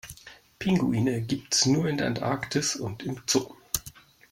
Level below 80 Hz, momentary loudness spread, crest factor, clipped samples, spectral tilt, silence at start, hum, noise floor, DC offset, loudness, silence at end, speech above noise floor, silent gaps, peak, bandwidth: -56 dBFS; 10 LU; 22 dB; under 0.1%; -4 dB/octave; 0.05 s; none; -50 dBFS; under 0.1%; -27 LUFS; 0.45 s; 24 dB; none; -6 dBFS; 16.5 kHz